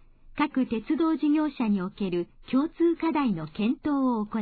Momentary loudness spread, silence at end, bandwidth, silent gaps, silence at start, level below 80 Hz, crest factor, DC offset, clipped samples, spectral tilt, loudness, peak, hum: 6 LU; 0 s; 4.7 kHz; none; 0.3 s; -54 dBFS; 14 dB; under 0.1%; under 0.1%; -10.5 dB/octave; -27 LUFS; -12 dBFS; none